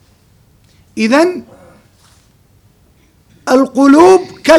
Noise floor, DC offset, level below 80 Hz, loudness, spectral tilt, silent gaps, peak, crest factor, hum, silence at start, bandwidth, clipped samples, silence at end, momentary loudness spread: -50 dBFS; under 0.1%; -50 dBFS; -9 LUFS; -4.5 dB/octave; none; 0 dBFS; 12 dB; none; 0.95 s; 13.5 kHz; 0.7%; 0 s; 20 LU